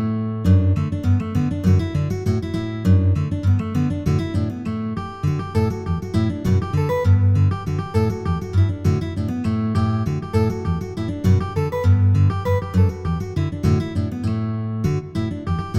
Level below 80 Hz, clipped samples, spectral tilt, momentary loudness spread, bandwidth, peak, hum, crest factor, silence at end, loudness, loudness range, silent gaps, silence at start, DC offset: -38 dBFS; under 0.1%; -8.5 dB/octave; 8 LU; 8.4 kHz; -6 dBFS; none; 14 dB; 0 s; -21 LUFS; 2 LU; none; 0 s; under 0.1%